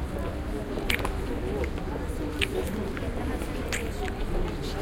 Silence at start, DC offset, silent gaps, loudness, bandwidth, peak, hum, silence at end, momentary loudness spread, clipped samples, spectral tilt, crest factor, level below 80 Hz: 0 s; under 0.1%; none; -31 LUFS; 17 kHz; -4 dBFS; none; 0 s; 5 LU; under 0.1%; -5 dB/octave; 26 dB; -34 dBFS